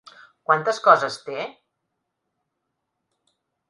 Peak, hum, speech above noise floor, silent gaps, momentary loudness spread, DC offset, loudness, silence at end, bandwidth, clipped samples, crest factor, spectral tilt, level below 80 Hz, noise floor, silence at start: 0 dBFS; none; 59 dB; none; 17 LU; under 0.1%; -20 LUFS; 2.2 s; 11.5 kHz; under 0.1%; 26 dB; -3.5 dB/octave; -78 dBFS; -79 dBFS; 0.5 s